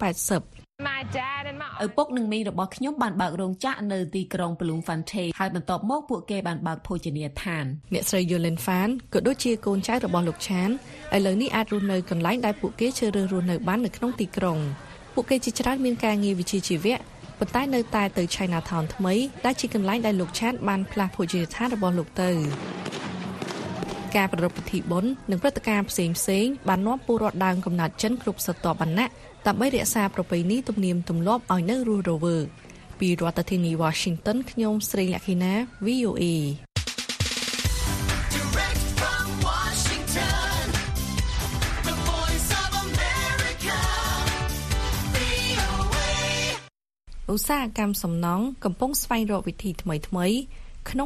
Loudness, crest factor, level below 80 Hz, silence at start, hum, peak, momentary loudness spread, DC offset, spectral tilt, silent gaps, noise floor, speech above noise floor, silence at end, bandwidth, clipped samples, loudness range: -26 LUFS; 20 dB; -38 dBFS; 0 s; none; -6 dBFS; 6 LU; under 0.1%; -4.5 dB/octave; none; -50 dBFS; 25 dB; 0 s; 14 kHz; under 0.1%; 3 LU